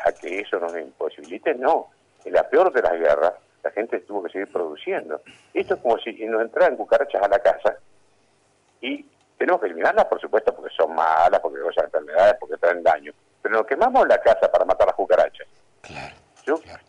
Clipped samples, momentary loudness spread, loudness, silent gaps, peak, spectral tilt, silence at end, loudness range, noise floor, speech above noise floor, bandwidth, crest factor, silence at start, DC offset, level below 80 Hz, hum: under 0.1%; 13 LU; -21 LUFS; none; -8 dBFS; -4.5 dB/octave; 0.1 s; 5 LU; -62 dBFS; 41 dB; 10 kHz; 14 dB; 0 s; under 0.1%; -54 dBFS; none